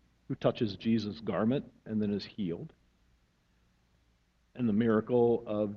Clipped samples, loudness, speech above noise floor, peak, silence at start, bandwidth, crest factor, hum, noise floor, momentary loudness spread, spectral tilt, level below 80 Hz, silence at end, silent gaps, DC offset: under 0.1%; -31 LUFS; 40 dB; -14 dBFS; 0.3 s; 6.6 kHz; 20 dB; none; -71 dBFS; 10 LU; -8.5 dB/octave; -64 dBFS; 0 s; none; under 0.1%